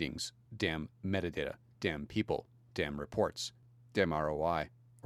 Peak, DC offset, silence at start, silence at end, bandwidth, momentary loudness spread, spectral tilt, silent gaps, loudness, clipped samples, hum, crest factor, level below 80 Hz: -14 dBFS; under 0.1%; 0 s; 0.35 s; 14.5 kHz; 9 LU; -5 dB/octave; none; -37 LUFS; under 0.1%; none; 22 dB; -56 dBFS